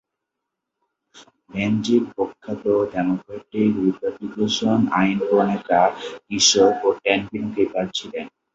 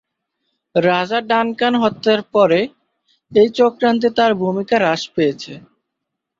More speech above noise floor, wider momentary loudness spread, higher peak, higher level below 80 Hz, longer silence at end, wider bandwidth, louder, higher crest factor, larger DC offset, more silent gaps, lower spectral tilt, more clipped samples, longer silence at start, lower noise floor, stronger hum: about the same, 61 dB vs 63 dB; first, 12 LU vs 5 LU; about the same, -2 dBFS vs -2 dBFS; about the same, -58 dBFS vs -60 dBFS; second, 0.25 s vs 0.8 s; about the same, 8.2 kHz vs 7.6 kHz; second, -20 LUFS vs -16 LUFS; about the same, 20 dB vs 16 dB; neither; neither; second, -4 dB/octave vs -5.5 dB/octave; neither; first, 1.15 s vs 0.75 s; about the same, -82 dBFS vs -79 dBFS; neither